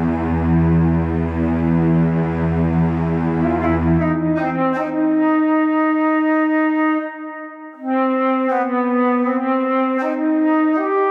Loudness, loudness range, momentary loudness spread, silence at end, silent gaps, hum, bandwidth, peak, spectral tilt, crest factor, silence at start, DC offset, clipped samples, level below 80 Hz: -18 LUFS; 2 LU; 4 LU; 0 s; none; none; 4.6 kHz; -6 dBFS; -10 dB/octave; 10 dB; 0 s; under 0.1%; under 0.1%; -36 dBFS